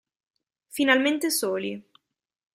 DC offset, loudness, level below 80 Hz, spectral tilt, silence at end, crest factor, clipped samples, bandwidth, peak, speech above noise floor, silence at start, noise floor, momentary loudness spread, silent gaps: under 0.1%; -24 LUFS; -74 dBFS; -2.5 dB/octave; 0.75 s; 22 dB; under 0.1%; 16 kHz; -4 dBFS; 59 dB; 0.75 s; -83 dBFS; 17 LU; none